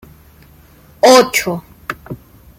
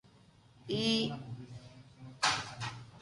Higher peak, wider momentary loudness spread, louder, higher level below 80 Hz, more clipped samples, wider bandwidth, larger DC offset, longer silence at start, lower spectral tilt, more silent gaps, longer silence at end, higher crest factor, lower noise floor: first, 0 dBFS vs -16 dBFS; about the same, 23 LU vs 22 LU; first, -11 LUFS vs -34 LUFS; first, -48 dBFS vs -66 dBFS; neither; first, 16.5 kHz vs 11.5 kHz; neither; first, 1.05 s vs 0.65 s; about the same, -3 dB/octave vs -3.5 dB/octave; neither; first, 0.45 s vs 0 s; second, 16 dB vs 22 dB; second, -45 dBFS vs -62 dBFS